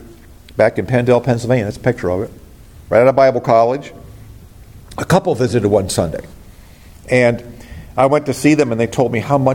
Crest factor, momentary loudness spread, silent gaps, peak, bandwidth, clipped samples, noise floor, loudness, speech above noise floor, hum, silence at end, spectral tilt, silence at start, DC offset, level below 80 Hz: 16 dB; 14 LU; none; 0 dBFS; 17 kHz; under 0.1%; -40 dBFS; -15 LUFS; 26 dB; none; 0 s; -6.5 dB/octave; 0 s; under 0.1%; -42 dBFS